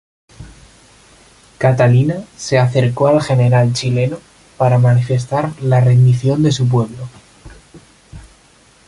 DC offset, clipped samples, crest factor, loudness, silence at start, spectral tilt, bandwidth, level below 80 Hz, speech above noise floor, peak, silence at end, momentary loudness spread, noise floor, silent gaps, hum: under 0.1%; under 0.1%; 14 dB; -14 LUFS; 0.4 s; -7 dB/octave; 11 kHz; -46 dBFS; 36 dB; 0 dBFS; 0.7 s; 9 LU; -49 dBFS; none; none